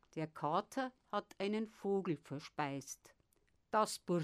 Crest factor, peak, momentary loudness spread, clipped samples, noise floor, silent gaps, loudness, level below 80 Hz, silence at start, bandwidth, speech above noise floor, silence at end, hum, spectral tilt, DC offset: 20 dB; -20 dBFS; 10 LU; under 0.1%; -77 dBFS; none; -40 LUFS; -80 dBFS; 0.15 s; 15.5 kHz; 37 dB; 0 s; none; -5 dB/octave; under 0.1%